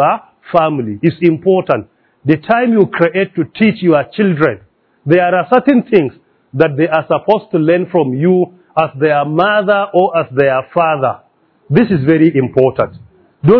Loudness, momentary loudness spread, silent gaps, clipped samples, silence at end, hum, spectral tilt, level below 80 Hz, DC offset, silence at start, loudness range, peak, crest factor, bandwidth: -13 LUFS; 7 LU; none; 0.3%; 0 s; none; -10.5 dB/octave; -52 dBFS; under 0.1%; 0 s; 1 LU; 0 dBFS; 12 dB; 5.4 kHz